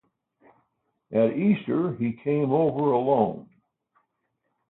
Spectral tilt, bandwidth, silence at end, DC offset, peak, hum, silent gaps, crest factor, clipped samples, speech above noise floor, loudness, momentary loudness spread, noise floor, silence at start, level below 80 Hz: -12.5 dB/octave; 4.1 kHz; 1.3 s; under 0.1%; -8 dBFS; none; none; 18 dB; under 0.1%; 54 dB; -24 LUFS; 6 LU; -77 dBFS; 1.1 s; -66 dBFS